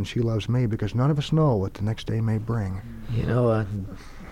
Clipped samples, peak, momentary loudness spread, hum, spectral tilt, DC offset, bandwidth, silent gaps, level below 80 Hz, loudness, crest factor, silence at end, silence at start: under 0.1%; -12 dBFS; 11 LU; none; -8 dB/octave; under 0.1%; 10 kHz; none; -42 dBFS; -25 LUFS; 14 dB; 0 s; 0 s